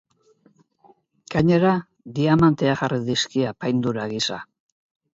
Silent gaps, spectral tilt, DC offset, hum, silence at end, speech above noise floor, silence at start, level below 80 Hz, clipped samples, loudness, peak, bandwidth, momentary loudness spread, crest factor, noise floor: none; -6 dB/octave; under 0.1%; none; 0.7 s; 39 dB; 1.3 s; -52 dBFS; under 0.1%; -21 LUFS; -6 dBFS; 8 kHz; 9 LU; 18 dB; -60 dBFS